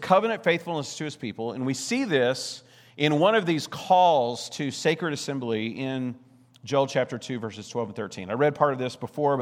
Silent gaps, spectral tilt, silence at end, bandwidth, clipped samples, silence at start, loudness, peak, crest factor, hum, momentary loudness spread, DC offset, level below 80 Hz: none; -5 dB/octave; 0 s; 16 kHz; under 0.1%; 0 s; -26 LUFS; -4 dBFS; 20 dB; none; 12 LU; under 0.1%; -76 dBFS